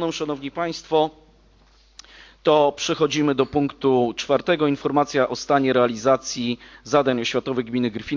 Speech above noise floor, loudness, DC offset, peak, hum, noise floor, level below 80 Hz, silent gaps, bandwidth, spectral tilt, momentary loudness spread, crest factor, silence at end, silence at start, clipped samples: 34 dB; -21 LUFS; under 0.1%; -4 dBFS; none; -55 dBFS; -54 dBFS; none; 7.6 kHz; -5 dB/octave; 8 LU; 18 dB; 0 s; 0 s; under 0.1%